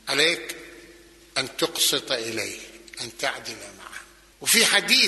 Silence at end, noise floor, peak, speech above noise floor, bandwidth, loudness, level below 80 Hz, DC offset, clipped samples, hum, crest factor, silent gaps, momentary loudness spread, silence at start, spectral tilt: 0 s; -50 dBFS; -2 dBFS; 26 dB; 12.5 kHz; -22 LUFS; -62 dBFS; under 0.1%; under 0.1%; none; 22 dB; none; 23 LU; 0.05 s; -0.5 dB/octave